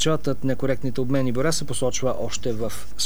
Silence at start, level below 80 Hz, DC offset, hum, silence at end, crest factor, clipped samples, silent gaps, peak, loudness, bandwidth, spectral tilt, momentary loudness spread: 0 s; -44 dBFS; 7%; none; 0 s; 16 dB; under 0.1%; none; -8 dBFS; -25 LUFS; 19.5 kHz; -4.5 dB/octave; 5 LU